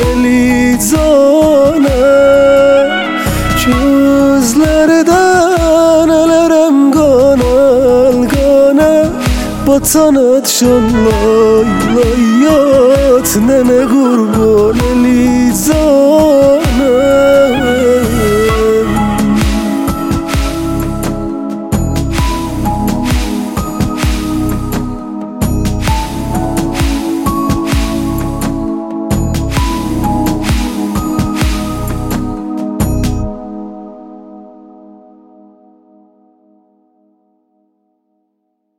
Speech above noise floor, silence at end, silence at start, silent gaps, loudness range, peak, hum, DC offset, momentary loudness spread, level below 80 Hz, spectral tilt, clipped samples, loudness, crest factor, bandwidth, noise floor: 58 dB; 4.3 s; 0 s; none; 8 LU; 0 dBFS; none; under 0.1%; 10 LU; -22 dBFS; -5.5 dB/octave; under 0.1%; -10 LUFS; 10 dB; 17 kHz; -66 dBFS